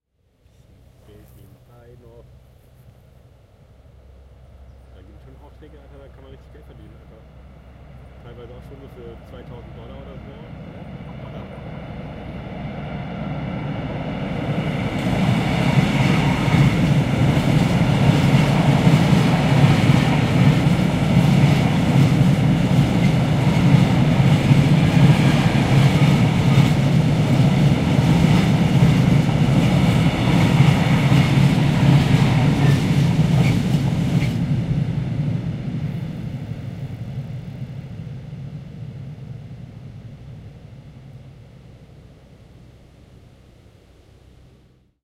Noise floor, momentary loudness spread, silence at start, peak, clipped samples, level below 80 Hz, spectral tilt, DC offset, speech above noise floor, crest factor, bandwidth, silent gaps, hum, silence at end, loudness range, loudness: -59 dBFS; 22 LU; 4.7 s; 0 dBFS; under 0.1%; -36 dBFS; -7 dB/octave; under 0.1%; 22 dB; 18 dB; 14 kHz; none; none; 3.75 s; 20 LU; -17 LUFS